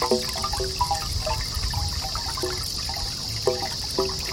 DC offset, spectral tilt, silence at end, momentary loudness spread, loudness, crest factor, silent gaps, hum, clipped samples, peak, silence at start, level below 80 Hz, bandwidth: under 0.1%; -3 dB/octave; 0 s; 2 LU; -26 LUFS; 18 dB; none; none; under 0.1%; -8 dBFS; 0 s; -36 dBFS; 16.5 kHz